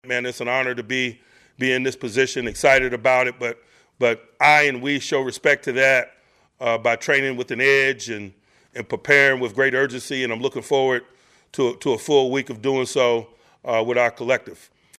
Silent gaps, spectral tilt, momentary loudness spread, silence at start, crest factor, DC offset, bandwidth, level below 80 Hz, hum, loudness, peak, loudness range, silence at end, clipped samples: none; -3.5 dB/octave; 12 LU; 0.05 s; 18 dB; under 0.1%; 14.5 kHz; -56 dBFS; none; -20 LUFS; -2 dBFS; 3 LU; 0.45 s; under 0.1%